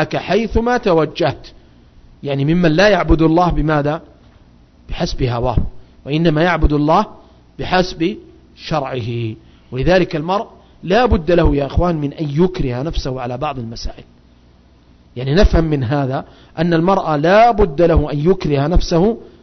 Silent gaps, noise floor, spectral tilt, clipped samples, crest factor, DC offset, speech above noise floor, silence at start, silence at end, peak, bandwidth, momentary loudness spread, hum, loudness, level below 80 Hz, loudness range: none; -48 dBFS; -7 dB/octave; under 0.1%; 14 dB; under 0.1%; 33 dB; 0 s; 0.15 s; -2 dBFS; 6.4 kHz; 15 LU; none; -16 LUFS; -26 dBFS; 6 LU